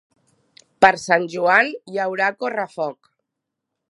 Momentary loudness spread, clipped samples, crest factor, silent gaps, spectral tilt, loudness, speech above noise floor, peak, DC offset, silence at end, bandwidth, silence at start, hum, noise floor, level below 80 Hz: 10 LU; under 0.1%; 22 dB; none; -4 dB/octave; -19 LUFS; 62 dB; 0 dBFS; under 0.1%; 1 s; 11.5 kHz; 0.8 s; none; -81 dBFS; -66 dBFS